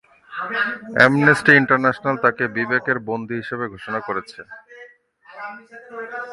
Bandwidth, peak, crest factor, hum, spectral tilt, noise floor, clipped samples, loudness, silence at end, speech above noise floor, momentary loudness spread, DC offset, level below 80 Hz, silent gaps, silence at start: 11.5 kHz; 0 dBFS; 20 dB; none; -6 dB/octave; -49 dBFS; under 0.1%; -18 LUFS; 0 s; 29 dB; 22 LU; under 0.1%; -60 dBFS; none; 0.3 s